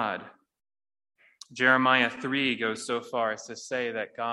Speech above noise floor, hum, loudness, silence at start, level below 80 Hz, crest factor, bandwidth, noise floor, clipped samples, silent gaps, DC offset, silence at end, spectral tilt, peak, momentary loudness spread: over 62 dB; none; -27 LUFS; 0 s; -76 dBFS; 22 dB; 12 kHz; under -90 dBFS; under 0.1%; none; under 0.1%; 0 s; -3.5 dB/octave; -6 dBFS; 13 LU